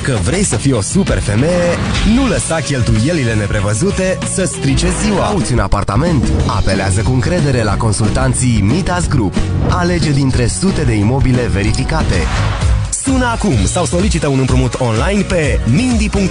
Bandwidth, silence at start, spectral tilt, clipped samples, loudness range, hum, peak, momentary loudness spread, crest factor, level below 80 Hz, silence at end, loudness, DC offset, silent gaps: 11 kHz; 0 s; -5.5 dB/octave; under 0.1%; 1 LU; none; 0 dBFS; 2 LU; 12 dB; -22 dBFS; 0 s; -14 LUFS; 0.5%; none